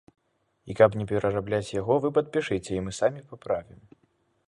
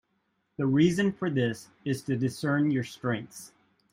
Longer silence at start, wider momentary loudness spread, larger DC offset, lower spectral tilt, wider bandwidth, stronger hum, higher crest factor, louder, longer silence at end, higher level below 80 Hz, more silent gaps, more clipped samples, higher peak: about the same, 0.65 s vs 0.6 s; second, 10 LU vs 13 LU; neither; about the same, -6 dB/octave vs -6.5 dB/octave; second, 11 kHz vs 16 kHz; neither; first, 24 dB vs 18 dB; about the same, -26 LUFS vs -28 LUFS; first, 0.85 s vs 0.45 s; first, -54 dBFS vs -66 dBFS; neither; neither; first, -4 dBFS vs -12 dBFS